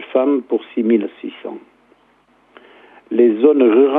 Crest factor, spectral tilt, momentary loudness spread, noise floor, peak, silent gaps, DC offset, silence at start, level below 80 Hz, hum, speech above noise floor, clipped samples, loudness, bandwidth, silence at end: 16 dB; -9.5 dB/octave; 19 LU; -55 dBFS; 0 dBFS; none; under 0.1%; 0 s; -74 dBFS; none; 41 dB; under 0.1%; -15 LUFS; 3.8 kHz; 0 s